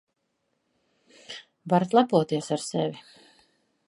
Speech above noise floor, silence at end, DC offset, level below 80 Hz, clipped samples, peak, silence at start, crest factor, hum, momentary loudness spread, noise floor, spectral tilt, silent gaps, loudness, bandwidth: 52 dB; 0.85 s; under 0.1%; -76 dBFS; under 0.1%; -6 dBFS; 1.3 s; 22 dB; none; 21 LU; -76 dBFS; -6 dB/octave; none; -25 LUFS; 11.5 kHz